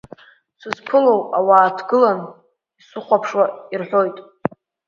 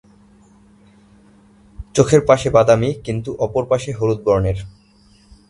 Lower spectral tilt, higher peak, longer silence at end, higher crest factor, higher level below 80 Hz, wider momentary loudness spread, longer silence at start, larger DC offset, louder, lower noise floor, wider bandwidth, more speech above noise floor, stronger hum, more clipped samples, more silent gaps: about the same, -6.5 dB/octave vs -6 dB/octave; about the same, 0 dBFS vs 0 dBFS; second, 0.65 s vs 0.8 s; about the same, 18 dB vs 18 dB; second, -66 dBFS vs -40 dBFS; first, 17 LU vs 12 LU; second, 0.65 s vs 1.8 s; neither; about the same, -18 LUFS vs -17 LUFS; first, -56 dBFS vs -51 dBFS; second, 7.2 kHz vs 11.5 kHz; about the same, 39 dB vs 36 dB; neither; neither; neither